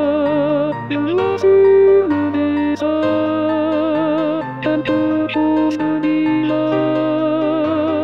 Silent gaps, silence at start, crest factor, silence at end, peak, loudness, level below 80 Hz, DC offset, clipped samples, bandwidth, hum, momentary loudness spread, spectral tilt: none; 0 s; 12 dB; 0 s; -4 dBFS; -16 LUFS; -58 dBFS; 0.3%; under 0.1%; 6.4 kHz; none; 7 LU; -8 dB/octave